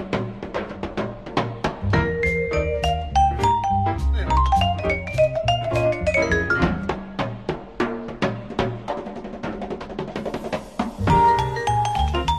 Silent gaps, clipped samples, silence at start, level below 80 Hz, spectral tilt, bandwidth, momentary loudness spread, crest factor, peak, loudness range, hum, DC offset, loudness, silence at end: none; under 0.1%; 0 s; -30 dBFS; -6 dB/octave; 13 kHz; 11 LU; 18 dB; -4 dBFS; 7 LU; none; 0.3%; -23 LUFS; 0 s